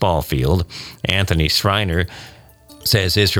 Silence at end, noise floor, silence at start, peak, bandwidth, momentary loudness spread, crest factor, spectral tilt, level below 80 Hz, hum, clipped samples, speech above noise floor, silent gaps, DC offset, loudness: 0 s; -44 dBFS; 0 s; -2 dBFS; 19.5 kHz; 10 LU; 16 dB; -4.5 dB/octave; -32 dBFS; none; under 0.1%; 26 dB; none; under 0.1%; -18 LUFS